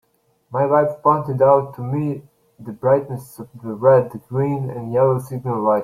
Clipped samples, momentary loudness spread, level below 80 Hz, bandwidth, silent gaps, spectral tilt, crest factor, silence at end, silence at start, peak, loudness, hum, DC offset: under 0.1%; 17 LU; -60 dBFS; 14 kHz; none; -9.5 dB/octave; 18 dB; 0 s; 0.5 s; -2 dBFS; -19 LUFS; none; under 0.1%